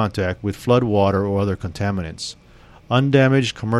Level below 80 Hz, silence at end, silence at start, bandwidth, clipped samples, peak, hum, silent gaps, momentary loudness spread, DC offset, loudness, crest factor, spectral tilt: -46 dBFS; 0 s; 0 s; 12.5 kHz; under 0.1%; -2 dBFS; none; none; 11 LU; under 0.1%; -19 LUFS; 16 dB; -6.5 dB/octave